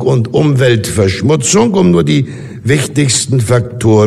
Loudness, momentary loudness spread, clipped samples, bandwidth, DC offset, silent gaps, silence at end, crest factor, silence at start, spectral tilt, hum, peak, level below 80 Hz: -11 LUFS; 4 LU; under 0.1%; 13.5 kHz; under 0.1%; none; 0 s; 10 dB; 0 s; -5.5 dB/octave; none; 0 dBFS; -42 dBFS